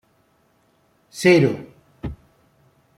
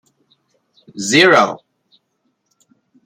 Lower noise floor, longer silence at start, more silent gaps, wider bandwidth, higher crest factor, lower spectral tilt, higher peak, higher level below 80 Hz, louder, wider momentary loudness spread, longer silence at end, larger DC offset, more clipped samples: second, -62 dBFS vs -68 dBFS; first, 1.15 s vs 0.95 s; neither; about the same, 14.5 kHz vs 15 kHz; about the same, 22 dB vs 20 dB; first, -6 dB/octave vs -3 dB/octave; about the same, -2 dBFS vs 0 dBFS; first, -48 dBFS vs -64 dBFS; second, -18 LUFS vs -13 LUFS; second, 20 LU vs 24 LU; second, 0.85 s vs 1.5 s; neither; neither